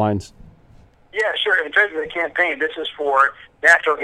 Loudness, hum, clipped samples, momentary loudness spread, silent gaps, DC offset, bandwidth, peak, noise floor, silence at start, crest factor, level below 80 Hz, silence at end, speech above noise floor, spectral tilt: -18 LUFS; none; under 0.1%; 10 LU; none; under 0.1%; 14 kHz; 0 dBFS; -49 dBFS; 0 s; 20 dB; -54 dBFS; 0 s; 30 dB; -4 dB/octave